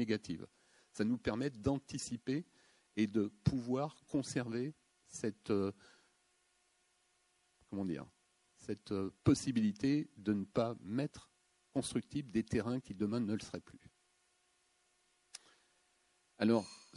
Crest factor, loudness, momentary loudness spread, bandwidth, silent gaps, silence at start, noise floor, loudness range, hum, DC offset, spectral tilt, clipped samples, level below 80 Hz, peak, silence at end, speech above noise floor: 22 dB; -38 LUFS; 15 LU; 11.5 kHz; none; 0 s; -76 dBFS; 8 LU; none; under 0.1%; -6 dB/octave; under 0.1%; -62 dBFS; -16 dBFS; 0 s; 39 dB